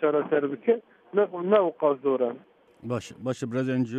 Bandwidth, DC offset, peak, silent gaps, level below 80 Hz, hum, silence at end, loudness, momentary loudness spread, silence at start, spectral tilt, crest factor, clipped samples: 9.4 kHz; under 0.1%; -8 dBFS; none; -72 dBFS; none; 0 s; -26 LUFS; 11 LU; 0 s; -7 dB/octave; 18 dB; under 0.1%